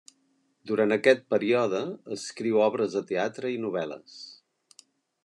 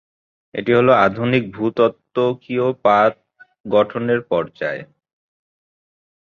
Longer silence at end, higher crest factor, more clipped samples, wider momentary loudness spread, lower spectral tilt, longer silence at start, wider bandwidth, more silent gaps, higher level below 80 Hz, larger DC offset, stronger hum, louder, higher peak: second, 0.9 s vs 1.45 s; about the same, 20 dB vs 18 dB; neither; first, 15 LU vs 12 LU; second, -5 dB/octave vs -8 dB/octave; about the same, 0.65 s vs 0.55 s; first, 11 kHz vs 6.8 kHz; second, none vs 3.60-3.64 s; second, -78 dBFS vs -58 dBFS; neither; neither; second, -27 LUFS vs -18 LUFS; second, -8 dBFS vs -2 dBFS